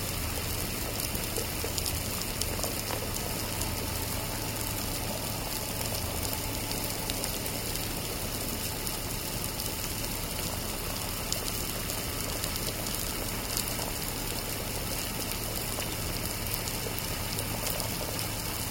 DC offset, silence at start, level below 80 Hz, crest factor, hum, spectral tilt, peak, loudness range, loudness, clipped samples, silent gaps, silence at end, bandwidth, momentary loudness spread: under 0.1%; 0 s; -42 dBFS; 26 dB; none; -3 dB/octave; -8 dBFS; 1 LU; -32 LUFS; under 0.1%; none; 0 s; 17 kHz; 2 LU